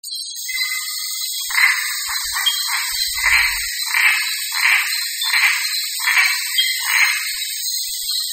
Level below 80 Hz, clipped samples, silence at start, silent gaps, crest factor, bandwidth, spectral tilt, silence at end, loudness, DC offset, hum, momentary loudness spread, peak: -50 dBFS; under 0.1%; 0.05 s; none; 18 dB; 16.5 kHz; 6 dB/octave; 0 s; -17 LUFS; under 0.1%; none; 7 LU; -2 dBFS